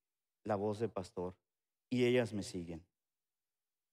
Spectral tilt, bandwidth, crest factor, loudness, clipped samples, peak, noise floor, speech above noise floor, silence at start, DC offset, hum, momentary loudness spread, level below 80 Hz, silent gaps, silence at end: -6 dB/octave; 13.5 kHz; 18 dB; -38 LUFS; under 0.1%; -22 dBFS; under -90 dBFS; over 53 dB; 0.45 s; under 0.1%; none; 16 LU; -72 dBFS; none; 1.1 s